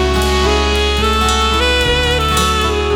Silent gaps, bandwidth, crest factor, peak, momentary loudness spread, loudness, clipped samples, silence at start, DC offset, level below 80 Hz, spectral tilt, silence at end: none; 18.5 kHz; 12 dB; -2 dBFS; 1 LU; -13 LUFS; under 0.1%; 0 s; under 0.1%; -20 dBFS; -4 dB/octave; 0 s